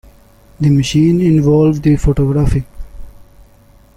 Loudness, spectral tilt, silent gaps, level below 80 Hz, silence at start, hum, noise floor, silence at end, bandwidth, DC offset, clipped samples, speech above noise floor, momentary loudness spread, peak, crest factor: -13 LUFS; -7.5 dB/octave; none; -26 dBFS; 0.6 s; none; -45 dBFS; 0.9 s; 12 kHz; under 0.1%; under 0.1%; 34 dB; 7 LU; -2 dBFS; 12 dB